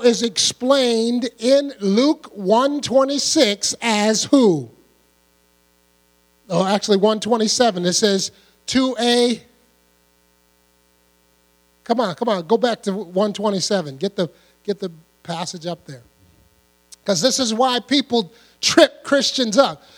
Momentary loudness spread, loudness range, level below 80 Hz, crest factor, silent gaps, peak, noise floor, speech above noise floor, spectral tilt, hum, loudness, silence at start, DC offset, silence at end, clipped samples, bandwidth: 12 LU; 7 LU; -62 dBFS; 20 dB; none; 0 dBFS; -59 dBFS; 41 dB; -3.5 dB/octave; none; -18 LUFS; 0 s; under 0.1%; 0.2 s; under 0.1%; 17.5 kHz